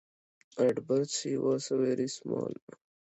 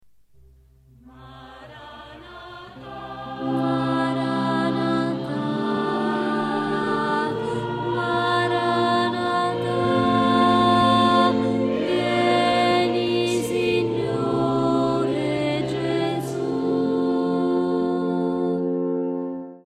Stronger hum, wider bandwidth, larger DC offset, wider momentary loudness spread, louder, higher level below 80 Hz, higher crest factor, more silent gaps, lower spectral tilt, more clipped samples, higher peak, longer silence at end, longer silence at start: neither; second, 8.2 kHz vs 13.5 kHz; neither; second, 9 LU vs 16 LU; second, -31 LUFS vs -22 LUFS; second, -78 dBFS vs -56 dBFS; about the same, 18 dB vs 16 dB; neither; about the same, -5 dB/octave vs -6 dB/octave; neither; second, -14 dBFS vs -6 dBFS; first, 0.6 s vs 0.1 s; second, 0.55 s vs 1.05 s